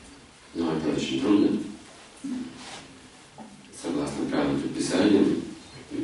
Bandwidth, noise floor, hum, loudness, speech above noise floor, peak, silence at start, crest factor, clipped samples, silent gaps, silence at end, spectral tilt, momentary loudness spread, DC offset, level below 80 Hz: 11.5 kHz; -49 dBFS; none; -26 LUFS; 24 dB; -8 dBFS; 0 s; 18 dB; under 0.1%; none; 0 s; -5.5 dB/octave; 22 LU; under 0.1%; -56 dBFS